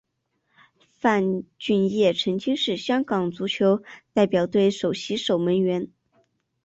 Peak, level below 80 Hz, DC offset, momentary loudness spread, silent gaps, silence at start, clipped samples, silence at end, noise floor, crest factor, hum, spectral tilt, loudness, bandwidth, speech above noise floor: -8 dBFS; -64 dBFS; under 0.1%; 6 LU; none; 1.05 s; under 0.1%; 0.8 s; -74 dBFS; 16 dB; none; -6 dB/octave; -23 LUFS; 8 kHz; 51 dB